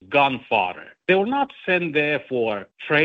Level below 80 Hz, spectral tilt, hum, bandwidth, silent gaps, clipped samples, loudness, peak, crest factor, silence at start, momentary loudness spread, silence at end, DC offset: -64 dBFS; -7 dB/octave; none; 6.8 kHz; none; under 0.1%; -22 LUFS; -4 dBFS; 18 dB; 0.1 s; 8 LU; 0 s; under 0.1%